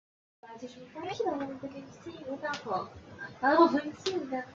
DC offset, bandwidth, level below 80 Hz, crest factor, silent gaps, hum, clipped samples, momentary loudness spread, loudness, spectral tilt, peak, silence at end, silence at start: under 0.1%; 7.6 kHz; -72 dBFS; 22 dB; none; none; under 0.1%; 22 LU; -31 LUFS; -5 dB/octave; -10 dBFS; 0 s; 0.45 s